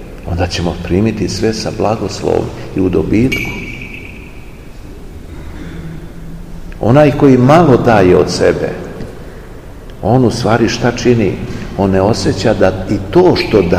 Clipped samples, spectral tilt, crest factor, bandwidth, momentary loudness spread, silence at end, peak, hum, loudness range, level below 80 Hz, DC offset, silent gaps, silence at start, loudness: 0.8%; -6.5 dB/octave; 12 dB; 15.5 kHz; 23 LU; 0 s; 0 dBFS; none; 9 LU; -30 dBFS; 0.7%; none; 0 s; -12 LUFS